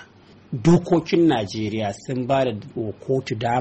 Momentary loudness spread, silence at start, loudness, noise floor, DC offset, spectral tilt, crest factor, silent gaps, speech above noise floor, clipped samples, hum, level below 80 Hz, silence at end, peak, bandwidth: 12 LU; 0 s; -22 LUFS; -49 dBFS; under 0.1%; -7 dB/octave; 14 dB; none; 28 dB; under 0.1%; none; -52 dBFS; 0 s; -8 dBFS; 8.4 kHz